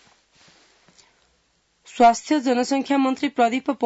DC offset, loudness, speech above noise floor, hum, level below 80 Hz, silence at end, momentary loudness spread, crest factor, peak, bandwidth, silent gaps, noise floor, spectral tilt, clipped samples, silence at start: under 0.1%; -20 LUFS; 46 dB; none; -64 dBFS; 0 s; 5 LU; 18 dB; -6 dBFS; 8 kHz; none; -66 dBFS; -3.5 dB/octave; under 0.1%; 1.95 s